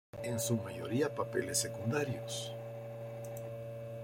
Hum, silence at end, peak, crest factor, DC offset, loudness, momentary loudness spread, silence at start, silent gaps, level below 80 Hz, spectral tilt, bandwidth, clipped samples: none; 0 s; -20 dBFS; 18 dB; under 0.1%; -37 LUFS; 11 LU; 0.15 s; none; -70 dBFS; -4.5 dB/octave; 16.5 kHz; under 0.1%